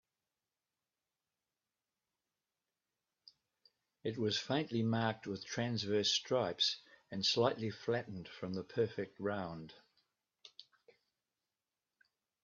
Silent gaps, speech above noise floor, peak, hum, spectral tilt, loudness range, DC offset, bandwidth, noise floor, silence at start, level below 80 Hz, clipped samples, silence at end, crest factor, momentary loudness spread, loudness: none; over 53 dB; -18 dBFS; none; -3.5 dB/octave; 11 LU; under 0.1%; 7.2 kHz; under -90 dBFS; 4.05 s; -80 dBFS; under 0.1%; 1.8 s; 24 dB; 15 LU; -37 LUFS